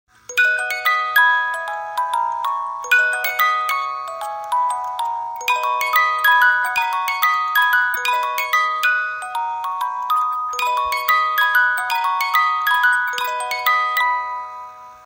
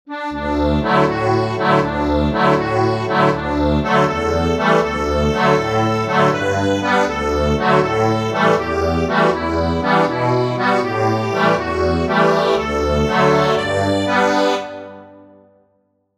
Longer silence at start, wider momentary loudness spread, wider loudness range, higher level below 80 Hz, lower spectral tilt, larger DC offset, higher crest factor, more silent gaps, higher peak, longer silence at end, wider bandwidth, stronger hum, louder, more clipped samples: first, 0.3 s vs 0.05 s; first, 9 LU vs 3 LU; about the same, 3 LU vs 1 LU; second, -66 dBFS vs -32 dBFS; second, 2 dB/octave vs -6 dB/octave; neither; about the same, 18 dB vs 16 dB; neither; about the same, -2 dBFS vs -2 dBFS; second, 0.05 s vs 1 s; first, 16.5 kHz vs 14 kHz; neither; about the same, -18 LUFS vs -16 LUFS; neither